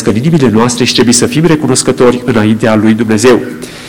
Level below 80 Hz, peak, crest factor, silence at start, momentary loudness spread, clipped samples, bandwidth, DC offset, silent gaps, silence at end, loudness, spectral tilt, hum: -38 dBFS; 0 dBFS; 8 dB; 0 s; 3 LU; under 0.1%; over 20 kHz; 1%; none; 0 s; -8 LUFS; -4.5 dB/octave; none